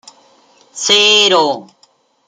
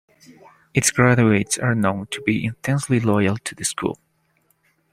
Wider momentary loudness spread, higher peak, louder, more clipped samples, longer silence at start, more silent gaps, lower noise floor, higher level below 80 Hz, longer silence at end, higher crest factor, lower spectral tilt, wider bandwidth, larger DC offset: first, 13 LU vs 9 LU; about the same, 0 dBFS vs -2 dBFS; first, -10 LUFS vs -20 LUFS; neither; about the same, 0.75 s vs 0.75 s; neither; second, -54 dBFS vs -65 dBFS; second, -64 dBFS vs -54 dBFS; second, 0.65 s vs 1 s; about the same, 16 dB vs 20 dB; second, -0.5 dB/octave vs -5 dB/octave; about the same, 15 kHz vs 15.5 kHz; neither